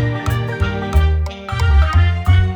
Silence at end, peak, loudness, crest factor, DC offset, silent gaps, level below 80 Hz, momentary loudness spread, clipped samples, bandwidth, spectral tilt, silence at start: 0 s; -2 dBFS; -17 LUFS; 14 dB; under 0.1%; none; -18 dBFS; 7 LU; under 0.1%; 9.2 kHz; -7 dB/octave; 0 s